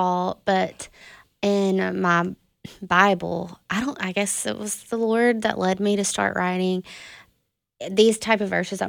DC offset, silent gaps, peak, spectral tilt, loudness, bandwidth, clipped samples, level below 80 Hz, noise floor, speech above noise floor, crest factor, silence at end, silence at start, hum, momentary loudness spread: under 0.1%; none; -2 dBFS; -4 dB/octave; -22 LUFS; 18.5 kHz; under 0.1%; -60 dBFS; -72 dBFS; 50 dB; 22 dB; 0 s; 0 s; none; 14 LU